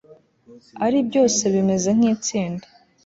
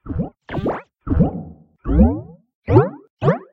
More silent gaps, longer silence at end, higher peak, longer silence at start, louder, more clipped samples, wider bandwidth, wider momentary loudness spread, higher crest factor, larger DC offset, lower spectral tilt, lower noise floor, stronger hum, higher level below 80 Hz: second, none vs 2.54-2.62 s, 3.10-3.17 s; first, 0.45 s vs 0.1 s; second, -6 dBFS vs 0 dBFS; first, 0.5 s vs 0.05 s; about the same, -20 LUFS vs -20 LUFS; neither; first, 8 kHz vs 5.8 kHz; second, 9 LU vs 18 LU; second, 14 dB vs 20 dB; neither; second, -5 dB/octave vs -11 dB/octave; first, -50 dBFS vs -36 dBFS; neither; second, -60 dBFS vs -26 dBFS